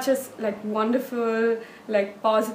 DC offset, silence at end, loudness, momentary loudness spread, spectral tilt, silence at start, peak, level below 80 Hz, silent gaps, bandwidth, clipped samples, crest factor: under 0.1%; 0 s; -25 LUFS; 6 LU; -4.5 dB/octave; 0 s; -8 dBFS; -74 dBFS; none; 15.5 kHz; under 0.1%; 16 dB